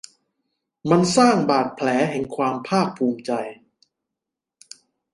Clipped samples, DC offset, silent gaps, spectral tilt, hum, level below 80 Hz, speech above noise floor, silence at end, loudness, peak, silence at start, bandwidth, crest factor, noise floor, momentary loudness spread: under 0.1%; under 0.1%; none; -5.5 dB/octave; none; -62 dBFS; 65 dB; 1.6 s; -20 LUFS; -2 dBFS; 0.85 s; 11.5 kHz; 22 dB; -85 dBFS; 11 LU